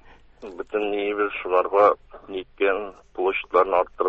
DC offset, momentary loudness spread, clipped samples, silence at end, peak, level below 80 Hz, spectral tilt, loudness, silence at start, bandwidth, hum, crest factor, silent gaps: under 0.1%; 17 LU; under 0.1%; 0 s; -4 dBFS; -56 dBFS; -6 dB/octave; -23 LUFS; 0.4 s; 6.2 kHz; none; 20 dB; none